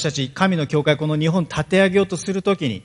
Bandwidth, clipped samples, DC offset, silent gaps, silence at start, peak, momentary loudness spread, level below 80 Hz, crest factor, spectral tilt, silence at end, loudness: 11 kHz; under 0.1%; under 0.1%; none; 0 s; 0 dBFS; 6 LU; -52 dBFS; 18 dB; -5.5 dB/octave; 0.05 s; -19 LUFS